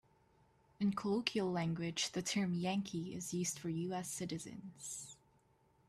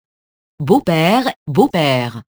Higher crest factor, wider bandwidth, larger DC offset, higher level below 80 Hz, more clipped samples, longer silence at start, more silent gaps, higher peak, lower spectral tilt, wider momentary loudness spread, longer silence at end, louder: first, 26 dB vs 16 dB; second, 14.5 kHz vs over 20 kHz; neither; second, -74 dBFS vs -52 dBFS; neither; first, 0.8 s vs 0.6 s; second, none vs 1.36-1.46 s; second, -16 dBFS vs 0 dBFS; second, -4.5 dB/octave vs -6 dB/octave; first, 10 LU vs 5 LU; first, 0.75 s vs 0.1 s; second, -39 LUFS vs -15 LUFS